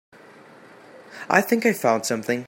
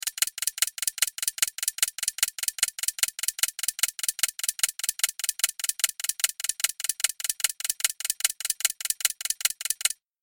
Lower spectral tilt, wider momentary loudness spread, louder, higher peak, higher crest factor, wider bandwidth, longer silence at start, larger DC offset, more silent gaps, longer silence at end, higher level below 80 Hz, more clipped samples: first, -4 dB/octave vs 5.5 dB/octave; first, 18 LU vs 0 LU; first, -21 LUFS vs -25 LUFS; first, 0 dBFS vs -4 dBFS; about the same, 24 dB vs 24 dB; about the same, 16.5 kHz vs 17 kHz; first, 0.95 s vs 0.05 s; neither; neither; second, 0 s vs 0.3 s; about the same, -70 dBFS vs -70 dBFS; neither